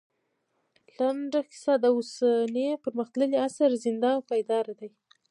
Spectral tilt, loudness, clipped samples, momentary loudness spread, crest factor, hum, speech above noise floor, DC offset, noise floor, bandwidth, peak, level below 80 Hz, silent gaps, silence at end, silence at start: -4.5 dB/octave; -27 LUFS; under 0.1%; 7 LU; 16 dB; none; 50 dB; under 0.1%; -76 dBFS; 11 kHz; -12 dBFS; -86 dBFS; none; 0.4 s; 1 s